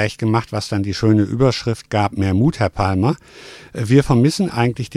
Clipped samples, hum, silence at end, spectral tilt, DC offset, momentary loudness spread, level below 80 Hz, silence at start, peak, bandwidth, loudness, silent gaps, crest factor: under 0.1%; none; 0 s; -6.5 dB/octave; under 0.1%; 10 LU; -42 dBFS; 0 s; 0 dBFS; 13 kHz; -18 LUFS; none; 16 dB